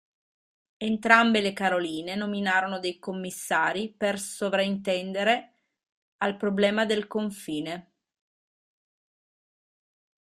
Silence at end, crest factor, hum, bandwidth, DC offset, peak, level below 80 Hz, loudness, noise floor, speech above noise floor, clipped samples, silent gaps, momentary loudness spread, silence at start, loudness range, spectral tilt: 2.4 s; 26 dB; none; 15 kHz; under 0.1%; -2 dBFS; -70 dBFS; -26 LUFS; under -90 dBFS; over 64 dB; under 0.1%; 5.92-6.19 s; 12 LU; 0.8 s; 6 LU; -4 dB/octave